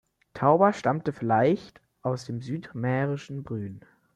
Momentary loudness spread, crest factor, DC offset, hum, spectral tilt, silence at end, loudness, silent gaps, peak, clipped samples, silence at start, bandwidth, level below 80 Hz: 14 LU; 20 dB; under 0.1%; none; -7.5 dB/octave; 0.35 s; -27 LUFS; none; -6 dBFS; under 0.1%; 0.35 s; 10.5 kHz; -64 dBFS